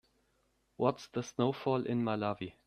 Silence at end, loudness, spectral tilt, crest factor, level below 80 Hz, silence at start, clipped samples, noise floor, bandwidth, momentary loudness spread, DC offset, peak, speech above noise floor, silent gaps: 0.15 s; -34 LUFS; -6.5 dB/octave; 22 dB; -72 dBFS; 0.8 s; under 0.1%; -75 dBFS; 10.5 kHz; 6 LU; under 0.1%; -14 dBFS; 42 dB; none